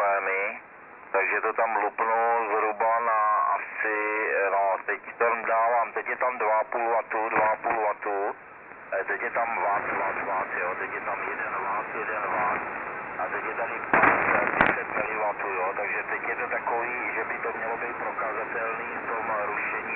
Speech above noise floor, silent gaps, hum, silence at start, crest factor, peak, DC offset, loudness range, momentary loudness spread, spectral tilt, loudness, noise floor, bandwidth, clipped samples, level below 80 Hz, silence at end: 19 dB; none; none; 0 s; 22 dB; -6 dBFS; under 0.1%; 4 LU; 7 LU; -9 dB/octave; -26 LUFS; -47 dBFS; 4.1 kHz; under 0.1%; -62 dBFS; 0 s